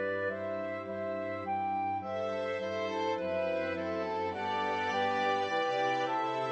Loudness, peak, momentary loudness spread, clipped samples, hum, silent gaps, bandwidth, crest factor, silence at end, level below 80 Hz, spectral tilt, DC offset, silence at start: -33 LUFS; -20 dBFS; 6 LU; under 0.1%; none; none; 8.4 kHz; 14 dB; 0 s; -78 dBFS; -5 dB/octave; under 0.1%; 0 s